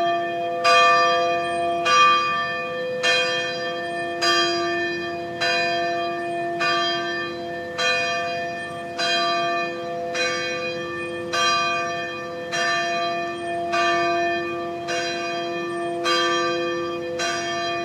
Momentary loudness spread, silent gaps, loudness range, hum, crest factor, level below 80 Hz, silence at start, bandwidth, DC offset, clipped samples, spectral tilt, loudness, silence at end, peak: 10 LU; none; 5 LU; none; 18 dB; -66 dBFS; 0 s; 15 kHz; under 0.1%; under 0.1%; -2.5 dB/octave; -22 LUFS; 0 s; -4 dBFS